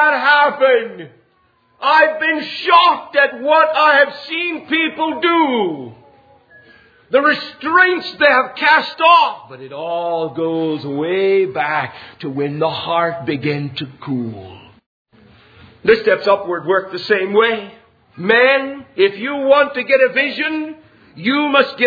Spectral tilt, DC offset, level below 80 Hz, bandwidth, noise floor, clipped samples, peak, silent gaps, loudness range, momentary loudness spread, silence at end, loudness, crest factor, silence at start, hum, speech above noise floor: -6.5 dB/octave; under 0.1%; -62 dBFS; 5 kHz; -58 dBFS; under 0.1%; 0 dBFS; 14.86-15.05 s; 7 LU; 13 LU; 0 s; -15 LUFS; 16 dB; 0 s; none; 42 dB